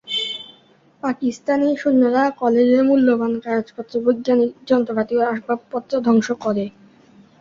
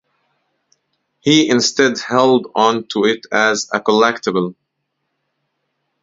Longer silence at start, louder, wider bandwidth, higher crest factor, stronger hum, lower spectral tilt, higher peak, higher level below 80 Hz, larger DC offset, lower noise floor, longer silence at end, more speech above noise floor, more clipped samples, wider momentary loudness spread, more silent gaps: second, 0.05 s vs 1.25 s; second, -19 LUFS vs -15 LUFS; about the same, 7.6 kHz vs 7.8 kHz; about the same, 16 dB vs 18 dB; neither; first, -5.5 dB/octave vs -3.5 dB/octave; second, -4 dBFS vs 0 dBFS; about the same, -62 dBFS vs -64 dBFS; neither; second, -53 dBFS vs -73 dBFS; second, 0.7 s vs 1.5 s; second, 35 dB vs 58 dB; neither; first, 10 LU vs 6 LU; neither